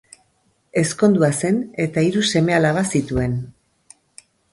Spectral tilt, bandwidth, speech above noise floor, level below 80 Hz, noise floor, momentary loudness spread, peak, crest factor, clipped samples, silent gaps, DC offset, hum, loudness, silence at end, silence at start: -5.5 dB/octave; 11.5 kHz; 46 dB; -44 dBFS; -64 dBFS; 8 LU; -2 dBFS; 18 dB; under 0.1%; none; under 0.1%; none; -19 LUFS; 1.05 s; 0.75 s